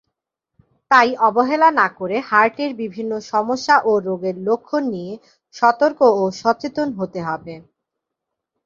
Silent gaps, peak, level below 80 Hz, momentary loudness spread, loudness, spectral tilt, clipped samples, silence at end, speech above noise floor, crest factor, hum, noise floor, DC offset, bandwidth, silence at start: none; 0 dBFS; -64 dBFS; 12 LU; -18 LUFS; -5 dB/octave; under 0.1%; 1.05 s; 63 dB; 18 dB; none; -81 dBFS; under 0.1%; 7.6 kHz; 0.9 s